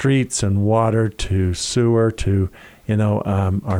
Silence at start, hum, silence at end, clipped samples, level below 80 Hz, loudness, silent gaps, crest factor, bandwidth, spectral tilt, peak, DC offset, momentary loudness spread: 0 s; none; 0 s; under 0.1%; -38 dBFS; -19 LUFS; none; 12 dB; 11.5 kHz; -6 dB/octave; -6 dBFS; under 0.1%; 5 LU